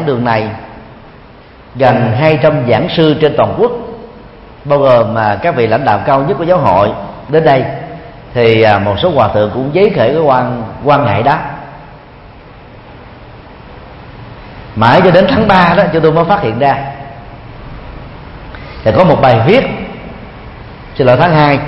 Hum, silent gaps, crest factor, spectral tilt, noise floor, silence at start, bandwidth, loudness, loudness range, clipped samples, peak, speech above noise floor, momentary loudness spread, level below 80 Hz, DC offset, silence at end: none; none; 12 dB; -8.5 dB/octave; -36 dBFS; 0 s; 6.4 kHz; -10 LUFS; 5 LU; 0.2%; 0 dBFS; 27 dB; 23 LU; -36 dBFS; under 0.1%; 0 s